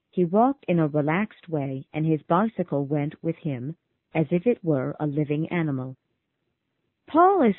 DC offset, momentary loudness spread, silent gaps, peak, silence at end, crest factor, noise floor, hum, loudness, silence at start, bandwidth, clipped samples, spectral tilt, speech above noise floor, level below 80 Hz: under 0.1%; 10 LU; none; -6 dBFS; 0 s; 18 dB; -78 dBFS; none; -25 LUFS; 0.15 s; 4 kHz; under 0.1%; -12.5 dB/octave; 54 dB; -64 dBFS